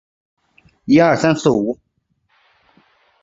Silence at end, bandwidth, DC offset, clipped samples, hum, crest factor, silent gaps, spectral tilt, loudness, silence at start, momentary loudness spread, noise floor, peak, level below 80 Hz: 1.5 s; 7.8 kHz; under 0.1%; under 0.1%; none; 18 dB; none; -6 dB/octave; -15 LUFS; 0.85 s; 18 LU; -66 dBFS; 0 dBFS; -54 dBFS